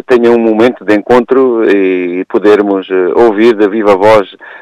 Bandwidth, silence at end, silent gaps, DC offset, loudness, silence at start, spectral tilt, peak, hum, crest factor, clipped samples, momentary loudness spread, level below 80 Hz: 9.8 kHz; 0.05 s; none; under 0.1%; -8 LUFS; 0.1 s; -6.5 dB/octave; 0 dBFS; none; 8 dB; 0.3%; 5 LU; -44 dBFS